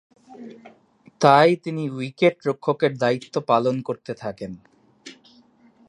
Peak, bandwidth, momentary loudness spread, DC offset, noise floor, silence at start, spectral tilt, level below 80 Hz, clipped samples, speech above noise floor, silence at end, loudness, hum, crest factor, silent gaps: 0 dBFS; 11 kHz; 21 LU; under 0.1%; -55 dBFS; 0.3 s; -6 dB/octave; -66 dBFS; under 0.1%; 34 dB; 0.75 s; -21 LUFS; none; 22 dB; none